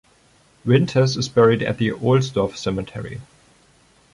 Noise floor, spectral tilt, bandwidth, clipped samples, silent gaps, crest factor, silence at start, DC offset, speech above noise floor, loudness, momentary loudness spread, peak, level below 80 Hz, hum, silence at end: -56 dBFS; -6.5 dB/octave; 11 kHz; under 0.1%; none; 18 dB; 0.65 s; under 0.1%; 37 dB; -19 LUFS; 15 LU; -4 dBFS; -50 dBFS; none; 0.9 s